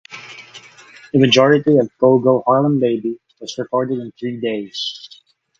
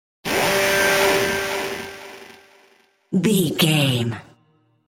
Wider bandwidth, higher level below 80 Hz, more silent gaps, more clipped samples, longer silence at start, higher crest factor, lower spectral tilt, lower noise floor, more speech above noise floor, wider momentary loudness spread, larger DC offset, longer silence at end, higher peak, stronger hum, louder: second, 7.8 kHz vs 17 kHz; second, -60 dBFS vs -52 dBFS; neither; neither; second, 0.1 s vs 0.25 s; about the same, 18 dB vs 18 dB; first, -6 dB/octave vs -4 dB/octave; second, -49 dBFS vs -61 dBFS; second, 33 dB vs 42 dB; first, 20 LU vs 17 LU; neither; about the same, 0.55 s vs 0.65 s; first, 0 dBFS vs -4 dBFS; neither; first, -16 LUFS vs -19 LUFS